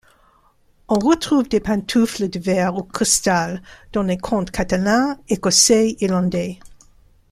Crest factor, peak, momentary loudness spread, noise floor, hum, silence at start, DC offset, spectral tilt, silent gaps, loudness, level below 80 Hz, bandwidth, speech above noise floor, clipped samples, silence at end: 20 dB; 0 dBFS; 10 LU; -57 dBFS; none; 0.9 s; under 0.1%; -3.5 dB/octave; none; -18 LUFS; -44 dBFS; 14.5 kHz; 38 dB; under 0.1%; 0.6 s